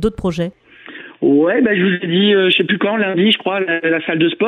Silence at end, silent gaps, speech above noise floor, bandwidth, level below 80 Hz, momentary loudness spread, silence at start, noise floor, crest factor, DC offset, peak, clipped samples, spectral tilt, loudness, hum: 0 s; none; 22 dB; 10 kHz; -44 dBFS; 9 LU; 0 s; -36 dBFS; 12 dB; under 0.1%; -2 dBFS; under 0.1%; -6.5 dB/octave; -15 LUFS; none